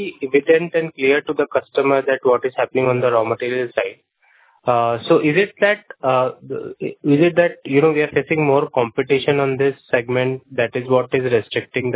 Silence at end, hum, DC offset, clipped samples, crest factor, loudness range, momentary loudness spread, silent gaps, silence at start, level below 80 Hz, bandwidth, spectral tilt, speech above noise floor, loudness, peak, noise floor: 0 s; none; under 0.1%; under 0.1%; 16 dB; 2 LU; 7 LU; none; 0 s; -60 dBFS; 4 kHz; -10 dB/octave; 38 dB; -18 LUFS; -2 dBFS; -56 dBFS